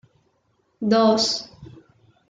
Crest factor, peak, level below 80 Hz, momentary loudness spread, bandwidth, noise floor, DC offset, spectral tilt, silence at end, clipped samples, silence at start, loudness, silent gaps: 18 dB; -6 dBFS; -64 dBFS; 13 LU; 9.4 kHz; -67 dBFS; under 0.1%; -4 dB/octave; 0.65 s; under 0.1%; 0.8 s; -20 LUFS; none